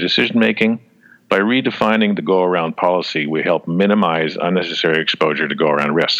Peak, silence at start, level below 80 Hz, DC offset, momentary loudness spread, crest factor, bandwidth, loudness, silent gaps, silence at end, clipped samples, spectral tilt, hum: -2 dBFS; 0 s; -62 dBFS; under 0.1%; 4 LU; 14 dB; 7.8 kHz; -16 LUFS; none; 0 s; under 0.1%; -6 dB/octave; none